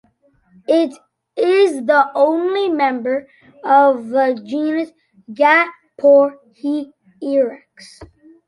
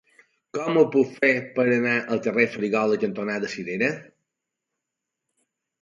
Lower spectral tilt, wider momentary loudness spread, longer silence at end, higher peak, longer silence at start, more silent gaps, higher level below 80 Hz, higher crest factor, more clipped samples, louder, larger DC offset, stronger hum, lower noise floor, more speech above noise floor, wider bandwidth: second, -4.5 dB/octave vs -6 dB/octave; first, 15 LU vs 9 LU; second, 0.4 s vs 1.8 s; about the same, -2 dBFS vs -4 dBFS; first, 0.7 s vs 0.55 s; neither; first, -62 dBFS vs -72 dBFS; about the same, 16 dB vs 20 dB; neither; first, -16 LUFS vs -23 LUFS; neither; neither; second, -57 dBFS vs -84 dBFS; second, 41 dB vs 61 dB; first, 11.5 kHz vs 7.6 kHz